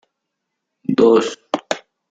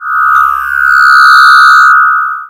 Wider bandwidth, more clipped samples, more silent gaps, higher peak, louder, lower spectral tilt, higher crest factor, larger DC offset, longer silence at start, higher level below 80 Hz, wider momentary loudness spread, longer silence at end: second, 9 kHz vs 16.5 kHz; second, under 0.1% vs 5%; neither; about the same, -2 dBFS vs 0 dBFS; second, -18 LUFS vs -3 LUFS; first, -5 dB/octave vs 3 dB/octave; first, 18 dB vs 6 dB; neither; first, 0.9 s vs 0 s; second, -62 dBFS vs -44 dBFS; first, 14 LU vs 7 LU; first, 0.35 s vs 0.05 s